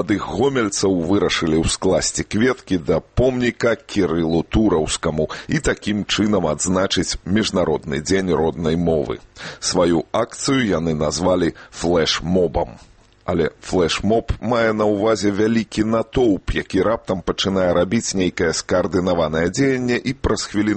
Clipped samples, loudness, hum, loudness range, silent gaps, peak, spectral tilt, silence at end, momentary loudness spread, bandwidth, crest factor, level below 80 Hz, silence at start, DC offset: under 0.1%; -19 LUFS; none; 1 LU; none; -4 dBFS; -4.5 dB/octave; 0 s; 4 LU; 8.8 kHz; 14 dB; -36 dBFS; 0 s; under 0.1%